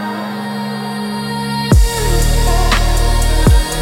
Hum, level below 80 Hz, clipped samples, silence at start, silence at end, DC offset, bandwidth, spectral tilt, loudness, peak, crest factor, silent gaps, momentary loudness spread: none; -16 dBFS; under 0.1%; 0 s; 0 s; under 0.1%; 17 kHz; -4.5 dB/octave; -16 LUFS; 0 dBFS; 12 dB; none; 9 LU